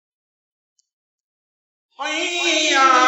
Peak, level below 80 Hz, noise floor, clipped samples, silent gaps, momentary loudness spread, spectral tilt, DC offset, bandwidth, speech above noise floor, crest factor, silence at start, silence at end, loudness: -2 dBFS; -88 dBFS; under -90 dBFS; under 0.1%; none; 12 LU; 2 dB/octave; under 0.1%; 8.6 kHz; over 73 dB; 18 dB; 2 s; 0 s; -17 LUFS